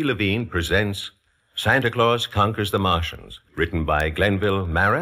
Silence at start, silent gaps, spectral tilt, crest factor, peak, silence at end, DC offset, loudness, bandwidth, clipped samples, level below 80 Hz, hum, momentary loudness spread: 0 s; none; -5.5 dB/octave; 18 dB; -4 dBFS; 0 s; under 0.1%; -21 LUFS; 15.5 kHz; under 0.1%; -38 dBFS; none; 12 LU